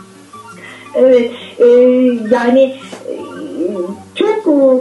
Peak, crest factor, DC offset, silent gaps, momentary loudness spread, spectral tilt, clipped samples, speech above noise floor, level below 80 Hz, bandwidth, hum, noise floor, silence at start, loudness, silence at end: 0 dBFS; 12 dB; under 0.1%; none; 18 LU; -6 dB/octave; under 0.1%; 25 dB; -62 dBFS; 11.5 kHz; none; -36 dBFS; 0.35 s; -12 LUFS; 0 s